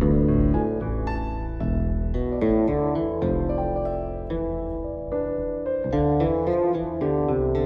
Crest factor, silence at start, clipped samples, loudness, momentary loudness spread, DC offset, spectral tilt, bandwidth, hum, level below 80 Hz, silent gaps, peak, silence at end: 16 dB; 0 s; under 0.1%; -25 LUFS; 8 LU; under 0.1%; -11 dB/octave; 5.8 kHz; none; -30 dBFS; none; -8 dBFS; 0 s